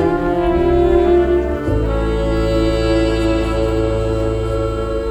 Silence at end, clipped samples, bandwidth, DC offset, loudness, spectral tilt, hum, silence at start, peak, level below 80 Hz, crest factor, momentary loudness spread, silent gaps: 0 s; under 0.1%; 9 kHz; under 0.1%; -17 LUFS; -7.5 dB/octave; none; 0 s; -4 dBFS; -22 dBFS; 12 dB; 6 LU; none